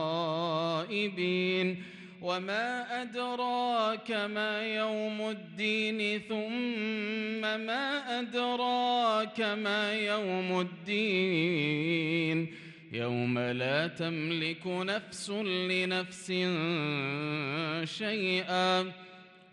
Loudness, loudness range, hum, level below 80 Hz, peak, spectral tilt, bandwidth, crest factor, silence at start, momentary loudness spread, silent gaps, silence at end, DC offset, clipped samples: -31 LUFS; 2 LU; none; -78 dBFS; -16 dBFS; -5 dB/octave; 11.5 kHz; 16 dB; 0 s; 6 LU; none; 0.15 s; under 0.1%; under 0.1%